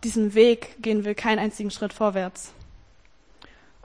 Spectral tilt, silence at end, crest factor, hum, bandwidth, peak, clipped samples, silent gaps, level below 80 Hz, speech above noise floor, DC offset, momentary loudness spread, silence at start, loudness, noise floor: -5 dB/octave; 1.1 s; 20 dB; none; 10.5 kHz; -6 dBFS; under 0.1%; none; -54 dBFS; 35 dB; 0.1%; 14 LU; 0 s; -23 LUFS; -58 dBFS